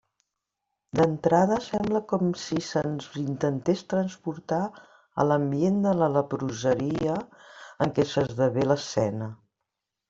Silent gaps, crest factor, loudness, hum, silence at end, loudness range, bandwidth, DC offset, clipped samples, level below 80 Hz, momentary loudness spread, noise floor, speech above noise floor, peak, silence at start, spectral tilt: none; 20 dB; -26 LUFS; none; 0.75 s; 2 LU; 7.8 kHz; under 0.1%; under 0.1%; -60 dBFS; 10 LU; -84 dBFS; 58 dB; -8 dBFS; 0.95 s; -6.5 dB/octave